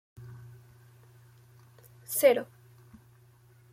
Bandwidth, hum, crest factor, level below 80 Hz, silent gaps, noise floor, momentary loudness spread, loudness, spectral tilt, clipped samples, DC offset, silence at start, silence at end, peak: 16.5 kHz; none; 24 dB; -72 dBFS; none; -59 dBFS; 27 LU; -26 LUFS; -3.5 dB/octave; under 0.1%; under 0.1%; 0.2 s; 1.3 s; -10 dBFS